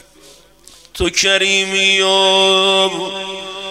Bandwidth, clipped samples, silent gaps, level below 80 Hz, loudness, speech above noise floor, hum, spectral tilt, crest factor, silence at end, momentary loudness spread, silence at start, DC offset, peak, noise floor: 15.5 kHz; under 0.1%; none; -42 dBFS; -12 LUFS; 31 dB; none; -1.5 dB/octave; 16 dB; 0 s; 14 LU; 0.95 s; under 0.1%; 0 dBFS; -45 dBFS